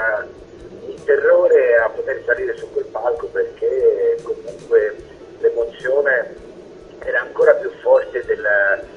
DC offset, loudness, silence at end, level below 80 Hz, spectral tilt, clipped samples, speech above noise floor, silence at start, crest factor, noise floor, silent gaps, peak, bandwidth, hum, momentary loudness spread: under 0.1%; -18 LUFS; 0 s; -52 dBFS; -5.5 dB/octave; under 0.1%; 21 dB; 0 s; 18 dB; -39 dBFS; none; 0 dBFS; 7.2 kHz; none; 15 LU